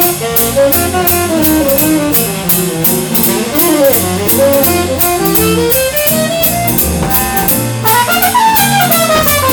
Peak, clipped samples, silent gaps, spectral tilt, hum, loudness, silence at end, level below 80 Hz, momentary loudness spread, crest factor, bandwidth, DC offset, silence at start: 0 dBFS; under 0.1%; none; -3.5 dB/octave; none; -9 LUFS; 0 s; -30 dBFS; 3 LU; 10 dB; over 20 kHz; under 0.1%; 0 s